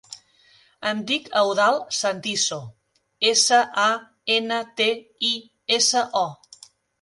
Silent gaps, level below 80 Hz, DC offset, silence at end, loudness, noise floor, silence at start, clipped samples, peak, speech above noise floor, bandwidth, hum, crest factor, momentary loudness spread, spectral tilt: none; -74 dBFS; under 0.1%; 0.65 s; -21 LUFS; -57 dBFS; 0.1 s; under 0.1%; -4 dBFS; 35 dB; 11.5 kHz; none; 18 dB; 10 LU; -1 dB/octave